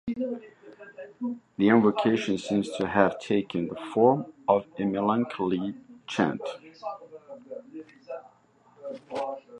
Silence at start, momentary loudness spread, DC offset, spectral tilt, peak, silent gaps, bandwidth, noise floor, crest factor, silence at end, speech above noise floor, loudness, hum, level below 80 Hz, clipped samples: 0.05 s; 21 LU; under 0.1%; -6.5 dB/octave; -4 dBFS; none; 10.5 kHz; -61 dBFS; 24 dB; 0 s; 34 dB; -27 LUFS; none; -64 dBFS; under 0.1%